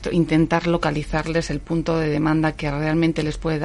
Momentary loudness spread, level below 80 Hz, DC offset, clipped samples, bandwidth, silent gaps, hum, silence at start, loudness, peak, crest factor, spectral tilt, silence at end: 6 LU; -36 dBFS; under 0.1%; under 0.1%; 11.5 kHz; none; none; 0 s; -21 LUFS; -4 dBFS; 16 dB; -7 dB/octave; 0 s